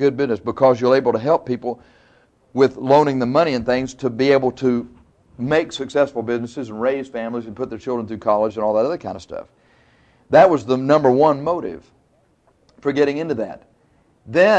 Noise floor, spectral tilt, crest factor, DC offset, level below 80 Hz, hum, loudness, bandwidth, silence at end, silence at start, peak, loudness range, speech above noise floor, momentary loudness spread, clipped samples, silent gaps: -60 dBFS; -6.5 dB/octave; 18 dB; under 0.1%; -54 dBFS; none; -19 LUFS; 8.6 kHz; 0 s; 0 s; -2 dBFS; 5 LU; 42 dB; 14 LU; under 0.1%; none